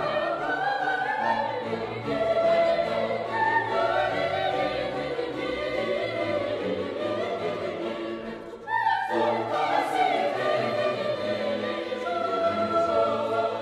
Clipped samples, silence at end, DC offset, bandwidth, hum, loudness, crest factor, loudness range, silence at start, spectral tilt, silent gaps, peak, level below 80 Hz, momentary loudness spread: under 0.1%; 0 s; under 0.1%; 12.5 kHz; none; -27 LUFS; 14 dB; 4 LU; 0 s; -5.5 dB/octave; none; -12 dBFS; -60 dBFS; 6 LU